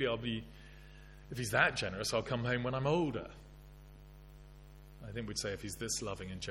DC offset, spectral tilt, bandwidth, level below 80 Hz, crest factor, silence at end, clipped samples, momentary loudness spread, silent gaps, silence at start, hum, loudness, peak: under 0.1%; -4 dB/octave; 16.5 kHz; -56 dBFS; 26 dB; 0 s; under 0.1%; 25 LU; none; 0 s; 50 Hz at -55 dBFS; -36 LUFS; -12 dBFS